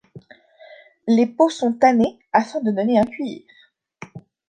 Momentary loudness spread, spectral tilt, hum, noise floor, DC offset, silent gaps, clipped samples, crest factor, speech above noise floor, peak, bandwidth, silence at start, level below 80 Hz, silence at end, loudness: 23 LU; -6 dB/octave; none; -48 dBFS; under 0.1%; none; under 0.1%; 20 dB; 30 dB; -2 dBFS; 9.2 kHz; 0.15 s; -60 dBFS; 0.3 s; -19 LUFS